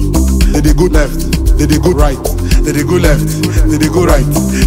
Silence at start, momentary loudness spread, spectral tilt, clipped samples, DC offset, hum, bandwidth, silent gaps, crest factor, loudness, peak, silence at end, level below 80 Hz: 0 s; 3 LU; -6 dB/octave; under 0.1%; under 0.1%; none; 16.5 kHz; none; 10 dB; -11 LUFS; 0 dBFS; 0 s; -12 dBFS